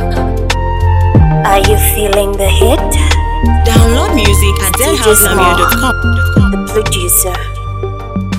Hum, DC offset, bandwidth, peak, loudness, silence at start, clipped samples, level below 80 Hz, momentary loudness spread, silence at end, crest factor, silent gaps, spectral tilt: none; under 0.1%; over 20 kHz; 0 dBFS; -10 LUFS; 0 s; 1%; -14 dBFS; 7 LU; 0 s; 10 dB; none; -4.5 dB/octave